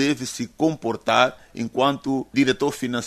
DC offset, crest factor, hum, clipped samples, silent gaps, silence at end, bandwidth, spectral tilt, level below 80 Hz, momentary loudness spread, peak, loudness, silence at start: under 0.1%; 20 dB; none; under 0.1%; none; 0 s; 13.5 kHz; -4.5 dB/octave; -58 dBFS; 8 LU; -2 dBFS; -22 LUFS; 0 s